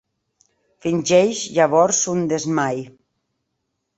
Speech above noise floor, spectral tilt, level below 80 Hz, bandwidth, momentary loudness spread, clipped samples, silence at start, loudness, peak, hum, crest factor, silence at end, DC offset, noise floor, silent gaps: 57 dB; -4 dB/octave; -62 dBFS; 8.2 kHz; 9 LU; under 0.1%; 0.85 s; -18 LUFS; -2 dBFS; none; 18 dB; 1.1 s; under 0.1%; -75 dBFS; none